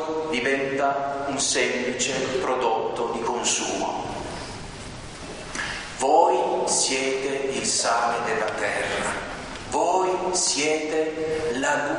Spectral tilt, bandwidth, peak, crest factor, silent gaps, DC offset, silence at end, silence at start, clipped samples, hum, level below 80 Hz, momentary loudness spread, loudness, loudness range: -2 dB/octave; 10.5 kHz; -6 dBFS; 20 dB; none; under 0.1%; 0 s; 0 s; under 0.1%; none; -50 dBFS; 12 LU; -24 LUFS; 4 LU